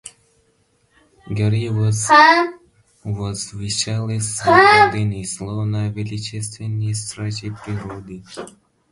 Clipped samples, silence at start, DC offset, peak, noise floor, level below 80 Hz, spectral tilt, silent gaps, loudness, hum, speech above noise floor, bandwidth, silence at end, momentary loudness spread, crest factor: under 0.1%; 0.05 s; under 0.1%; 0 dBFS; -62 dBFS; -48 dBFS; -4.5 dB/octave; none; -18 LUFS; none; 43 dB; 11.5 kHz; 0.45 s; 21 LU; 20 dB